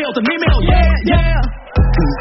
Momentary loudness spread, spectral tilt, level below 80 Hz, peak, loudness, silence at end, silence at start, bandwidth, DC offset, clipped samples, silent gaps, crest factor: 5 LU; -5.5 dB/octave; -14 dBFS; -2 dBFS; -15 LUFS; 0 s; 0 s; 5.8 kHz; under 0.1%; under 0.1%; none; 10 dB